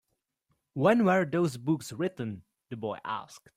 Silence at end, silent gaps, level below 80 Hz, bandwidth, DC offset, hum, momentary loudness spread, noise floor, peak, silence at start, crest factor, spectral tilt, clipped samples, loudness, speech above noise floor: 0.2 s; none; -70 dBFS; 16 kHz; under 0.1%; none; 16 LU; -78 dBFS; -10 dBFS; 0.75 s; 20 dB; -6.5 dB/octave; under 0.1%; -29 LUFS; 49 dB